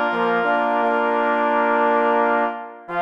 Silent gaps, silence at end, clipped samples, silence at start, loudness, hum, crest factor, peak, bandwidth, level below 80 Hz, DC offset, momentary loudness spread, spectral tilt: none; 0 s; under 0.1%; 0 s; -19 LUFS; none; 14 dB; -6 dBFS; 7.4 kHz; -66 dBFS; under 0.1%; 6 LU; -6.5 dB/octave